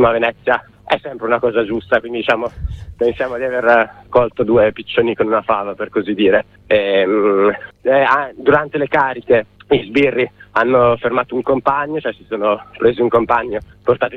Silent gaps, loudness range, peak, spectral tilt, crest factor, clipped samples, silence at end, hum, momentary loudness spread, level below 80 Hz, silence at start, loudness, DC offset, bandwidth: none; 2 LU; 0 dBFS; -7.5 dB/octave; 16 dB; under 0.1%; 0 s; none; 7 LU; -40 dBFS; 0 s; -16 LUFS; under 0.1%; 6.4 kHz